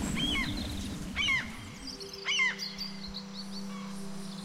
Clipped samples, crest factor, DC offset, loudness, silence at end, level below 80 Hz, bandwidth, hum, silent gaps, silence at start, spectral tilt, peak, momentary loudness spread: under 0.1%; 16 dB; under 0.1%; -33 LUFS; 0 s; -48 dBFS; 16 kHz; none; none; 0 s; -3 dB/octave; -18 dBFS; 14 LU